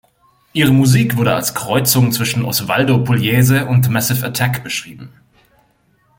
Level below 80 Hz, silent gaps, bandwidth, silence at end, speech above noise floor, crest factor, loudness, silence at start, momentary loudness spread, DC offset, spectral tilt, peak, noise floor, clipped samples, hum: -48 dBFS; none; 17 kHz; 1.1 s; 43 dB; 16 dB; -15 LUFS; 0.55 s; 7 LU; under 0.1%; -5 dB/octave; 0 dBFS; -57 dBFS; under 0.1%; none